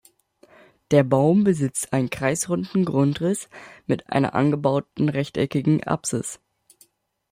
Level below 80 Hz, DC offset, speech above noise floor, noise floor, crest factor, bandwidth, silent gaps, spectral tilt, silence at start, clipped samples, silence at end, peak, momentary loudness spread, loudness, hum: -58 dBFS; under 0.1%; 38 dB; -60 dBFS; 18 dB; 16 kHz; none; -6 dB/octave; 0.9 s; under 0.1%; 0.95 s; -4 dBFS; 10 LU; -22 LUFS; none